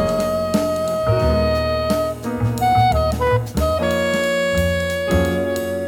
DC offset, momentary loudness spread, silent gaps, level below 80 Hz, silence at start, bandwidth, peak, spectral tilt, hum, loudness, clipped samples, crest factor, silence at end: 0.1%; 4 LU; none; -32 dBFS; 0 s; 19 kHz; -4 dBFS; -6 dB/octave; none; -19 LUFS; under 0.1%; 14 dB; 0 s